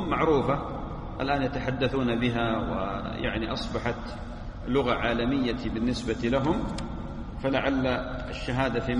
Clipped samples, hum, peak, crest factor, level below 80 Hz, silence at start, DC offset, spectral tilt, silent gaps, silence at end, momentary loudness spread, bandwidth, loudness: under 0.1%; none; -10 dBFS; 18 dB; -40 dBFS; 0 s; under 0.1%; -6.5 dB/octave; none; 0 s; 11 LU; 11 kHz; -28 LUFS